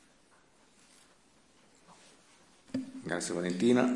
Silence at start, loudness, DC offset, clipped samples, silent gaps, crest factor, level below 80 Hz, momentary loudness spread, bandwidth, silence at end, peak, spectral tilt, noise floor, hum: 2.75 s; -33 LUFS; under 0.1%; under 0.1%; none; 24 dB; -78 dBFS; 13 LU; 12 kHz; 0 s; -12 dBFS; -5 dB/octave; -65 dBFS; none